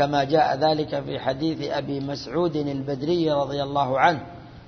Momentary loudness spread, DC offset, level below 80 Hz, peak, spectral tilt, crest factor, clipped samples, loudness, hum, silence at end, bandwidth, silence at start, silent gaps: 8 LU; under 0.1%; -54 dBFS; -4 dBFS; -6.5 dB/octave; 20 dB; under 0.1%; -24 LUFS; none; 0 s; 6.6 kHz; 0 s; none